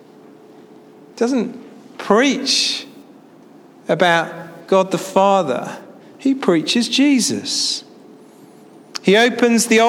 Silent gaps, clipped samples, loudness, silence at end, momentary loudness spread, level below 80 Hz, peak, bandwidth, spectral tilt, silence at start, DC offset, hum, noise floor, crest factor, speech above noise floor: none; under 0.1%; -17 LUFS; 0 s; 18 LU; -68 dBFS; 0 dBFS; 16.5 kHz; -3.5 dB/octave; 1.15 s; under 0.1%; none; -44 dBFS; 18 dB; 29 dB